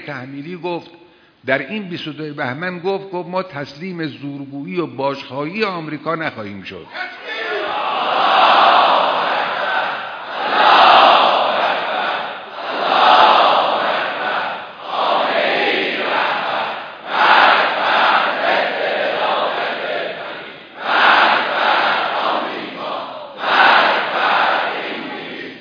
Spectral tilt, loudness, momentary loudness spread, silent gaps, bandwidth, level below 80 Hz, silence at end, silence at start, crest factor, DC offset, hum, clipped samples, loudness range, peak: -4.5 dB/octave; -16 LUFS; 17 LU; none; 5.4 kHz; -66 dBFS; 0 s; 0 s; 16 dB; under 0.1%; none; under 0.1%; 11 LU; 0 dBFS